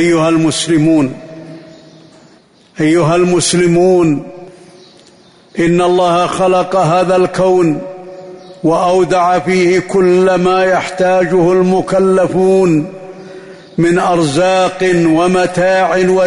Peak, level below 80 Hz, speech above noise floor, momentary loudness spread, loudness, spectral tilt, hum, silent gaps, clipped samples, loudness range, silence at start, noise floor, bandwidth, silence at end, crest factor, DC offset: -2 dBFS; -46 dBFS; 35 dB; 14 LU; -11 LUFS; -5.5 dB/octave; none; none; under 0.1%; 3 LU; 0 s; -45 dBFS; 11 kHz; 0 s; 10 dB; under 0.1%